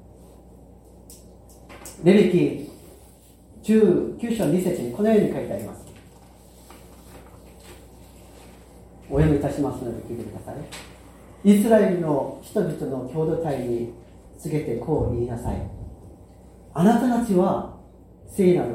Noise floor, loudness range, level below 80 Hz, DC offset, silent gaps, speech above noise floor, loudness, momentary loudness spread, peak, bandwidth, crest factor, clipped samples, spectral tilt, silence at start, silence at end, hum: -50 dBFS; 6 LU; -44 dBFS; under 0.1%; none; 28 dB; -22 LUFS; 19 LU; -4 dBFS; 16.5 kHz; 20 dB; under 0.1%; -7.5 dB/octave; 0.2 s; 0 s; none